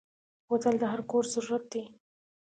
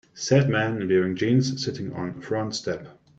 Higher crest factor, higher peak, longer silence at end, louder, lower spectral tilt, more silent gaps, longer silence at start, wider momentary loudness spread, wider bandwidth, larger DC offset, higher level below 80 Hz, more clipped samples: about the same, 18 dB vs 20 dB; second, -14 dBFS vs -4 dBFS; first, 0.6 s vs 0.25 s; second, -31 LUFS vs -24 LUFS; second, -4.5 dB/octave vs -6 dB/octave; neither; first, 0.5 s vs 0.15 s; about the same, 11 LU vs 11 LU; first, 9.4 kHz vs 8 kHz; neither; second, -76 dBFS vs -60 dBFS; neither